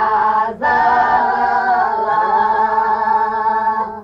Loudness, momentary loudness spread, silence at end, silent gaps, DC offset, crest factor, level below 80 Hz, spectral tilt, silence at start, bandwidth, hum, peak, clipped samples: -15 LUFS; 3 LU; 0 s; none; under 0.1%; 10 dB; -50 dBFS; -5.5 dB/octave; 0 s; 6.6 kHz; none; -4 dBFS; under 0.1%